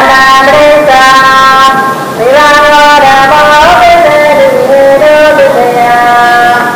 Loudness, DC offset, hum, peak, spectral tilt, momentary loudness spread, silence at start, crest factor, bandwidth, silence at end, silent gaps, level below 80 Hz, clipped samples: -3 LUFS; under 0.1%; none; 0 dBFS; -3 dB/octave; 3 LU; 0 s; 2 dB; over 20 kHz; 0 s; none; -32 dBFS; 30%